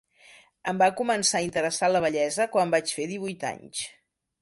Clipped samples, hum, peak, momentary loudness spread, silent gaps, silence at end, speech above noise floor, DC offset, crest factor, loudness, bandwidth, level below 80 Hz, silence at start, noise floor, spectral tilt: under 0.1%; none; -8 dBFS; 11 LU; none; 0.55 s; 29 dB; under 0.1%; 18 dB; -26 LUFS; 11.5 kHz; -66 dBFS; 0.65 s; -55 dBFS; -3 dB/octave